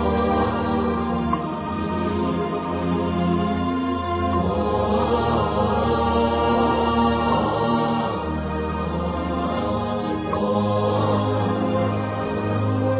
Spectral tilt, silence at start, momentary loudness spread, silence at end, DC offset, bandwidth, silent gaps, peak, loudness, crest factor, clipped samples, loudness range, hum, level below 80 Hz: -11.5 dB/octave; 0 s; 5 LU; 0 s; under 0.1%; 4 kHz; none; -8 dBFS; -22 LUFS; 14 dB; under 0.1%; 3 LU; none; -36 dBFS